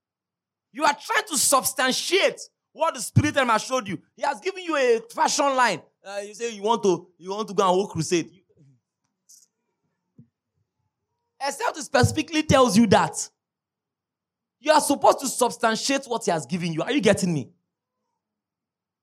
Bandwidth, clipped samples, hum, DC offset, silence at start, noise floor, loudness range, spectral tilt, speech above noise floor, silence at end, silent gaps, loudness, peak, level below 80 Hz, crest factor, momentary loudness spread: 16 kHz; under 0.1%; none; under 0.1%; 0.75 s; -89 dBFS; 6 LU; -4 dB/octave; 66 dB; 1.55 s; none; -22 LUFS; -4 dBFS; -58 dBFS; 20 dB; 13 LU